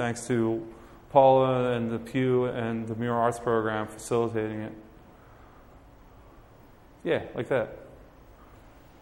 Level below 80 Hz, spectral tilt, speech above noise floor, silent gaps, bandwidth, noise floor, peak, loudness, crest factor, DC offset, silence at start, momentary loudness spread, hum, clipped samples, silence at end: -56 dBFS; -6.5 dB/octave; 27 dB; none; 16 kHz; -53 dBFS; -6 dBFS; -27 LUFS; 22 dB; under 0.1%; 0 s; 16 LU; none; under 0.1%; 0.45 s